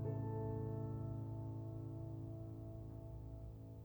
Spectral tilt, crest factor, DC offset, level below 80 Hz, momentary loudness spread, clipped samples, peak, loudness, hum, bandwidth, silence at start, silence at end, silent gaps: -11 dB/octave; 14 dB; under 0.1%; -58 dBFS; 9 LU; under 0.1%; -32 dBFS; -48 LUFS; none; over 20 kHz; 0 s; 0 s; none